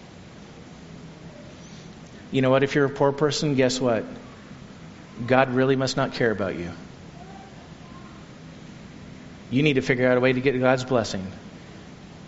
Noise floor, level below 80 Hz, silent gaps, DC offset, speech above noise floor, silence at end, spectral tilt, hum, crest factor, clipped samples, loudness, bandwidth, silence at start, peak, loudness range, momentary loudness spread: -44 dBFS; -54 dBFS; none; under 0.1%; 22 dB; 0 s; -5 dB/octave; none; 24 dB; under 0.1%; -22 LUFS; 8 kHz; 0 s; -2 dBFS; 6 LU; 23 LU